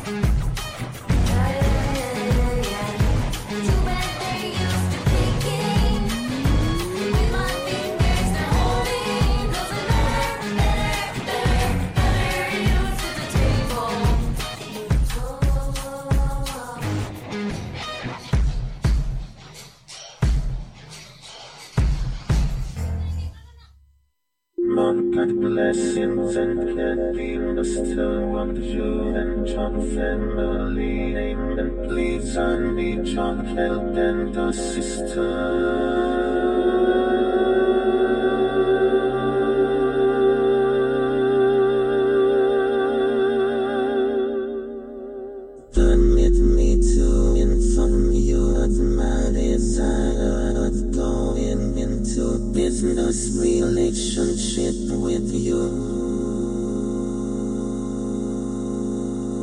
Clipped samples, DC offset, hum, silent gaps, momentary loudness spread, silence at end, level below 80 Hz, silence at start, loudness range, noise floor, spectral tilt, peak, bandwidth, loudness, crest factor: under 0.1%; under 0.1%; none; none; 9 LU; 0 s; -26 dBFS; 0 s; 7 LU; -74 dBFS; -6 dB/octave; -6 dBFS; 15.5 kHz; -22 LUFS; 14 dB